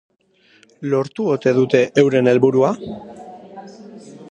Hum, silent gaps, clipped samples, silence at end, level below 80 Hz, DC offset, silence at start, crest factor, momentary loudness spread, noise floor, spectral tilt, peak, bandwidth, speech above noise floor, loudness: none; none; under 0.1%; 0 s; -62 dBFS; under 0.1%; 0.8 s; 18 dB; 24 LU; -39 dBFS; -7 dB/octave; 0 dBFS; 9.2 kHz; 22 dB; -16 LUFS